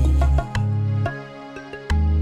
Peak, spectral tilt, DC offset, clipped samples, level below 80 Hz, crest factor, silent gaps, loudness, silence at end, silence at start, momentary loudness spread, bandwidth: -8 dBFS; -7.5 dB/octave; under 0.1%; under 0.1%; -22 dBFS; 12 dB; none; -22 LUFS; 0 s; 0 s; 16 LU; 9.8 kHz